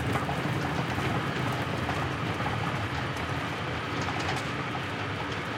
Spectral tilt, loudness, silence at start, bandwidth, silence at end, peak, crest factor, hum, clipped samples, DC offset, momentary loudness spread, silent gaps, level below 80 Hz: -5.5 dB/octave; -30 LUFS; 0 s; 16.5 kHz; 0 s; -14 dBFS; 16 dB; none; under 0.1%; under 0.1%; 3 LU; none; -50 dBFS